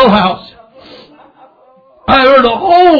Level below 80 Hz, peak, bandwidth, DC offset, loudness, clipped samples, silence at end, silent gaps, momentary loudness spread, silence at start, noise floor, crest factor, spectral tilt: -38 dBFS; 0 dBFS; 5.4 kHz; under 0.1%; -8 LUFS; 1%; 0 s; none; 16 LU; 0 s; -45 dBFS; 10 dB; -7.5 dB/octave